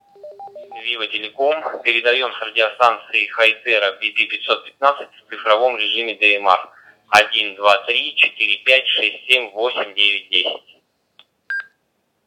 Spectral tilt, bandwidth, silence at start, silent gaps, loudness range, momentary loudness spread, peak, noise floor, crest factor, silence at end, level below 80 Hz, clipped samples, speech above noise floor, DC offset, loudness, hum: -1 dB/octave; 18.5 kHz; 0.25 s; none; 3 LU; 12 LU; 0 dBFS; -68 dBFS; 20 dB; 0.65 s; -70 dBFS; under 0.1%; 50 dB; under 0.1%; -16 LUFS; none